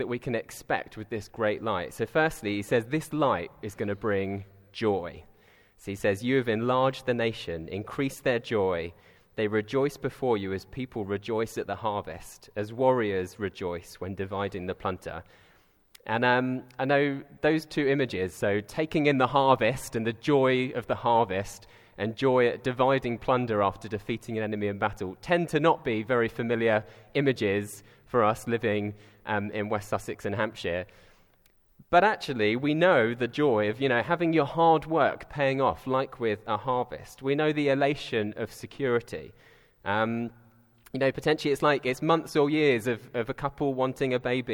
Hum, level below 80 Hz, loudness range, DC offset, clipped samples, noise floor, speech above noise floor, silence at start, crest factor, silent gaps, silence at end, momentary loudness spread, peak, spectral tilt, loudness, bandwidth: none; -58 dBFS; 5 LU; under 0.1%; under 0.1%; -63 dBFS; 36 dB; 0 s; 22 dB; none; 0 s; 12 LU; -6 dBFS; -6 dB/octave; -28 LUFS; 19.5 kHz